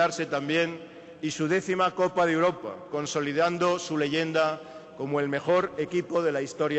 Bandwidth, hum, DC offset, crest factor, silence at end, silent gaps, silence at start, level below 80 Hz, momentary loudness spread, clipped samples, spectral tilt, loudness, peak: 8.4 kHz; none; under 0.1%; 14 dB; 0 s; none; 0 s; -68 dBFS; 10 LU; under 0.1%; -5 dB/octave; -27 LUFS; -14 dBFS